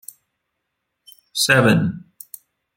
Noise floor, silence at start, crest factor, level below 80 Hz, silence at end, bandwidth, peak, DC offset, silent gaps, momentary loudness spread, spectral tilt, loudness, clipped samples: -77 dBFS; 1.35 s; 22 dB; -56 dBFS; 0.8 s; 17 kHz; 0 dBFS; under 0.1%; none; 24 LU; -4.5 dB/octave; -17 LUFS; under 0.1%